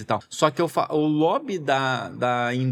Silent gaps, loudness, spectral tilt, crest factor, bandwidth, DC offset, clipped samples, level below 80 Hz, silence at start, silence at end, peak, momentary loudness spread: none; -23 LUFS; -5.5 dB/octave; 18 dB; 14.5 kHz; under 0.1%; under 0.1%; -70 dBFS; 0 s; 0 s; -4 dBFS; 5 LU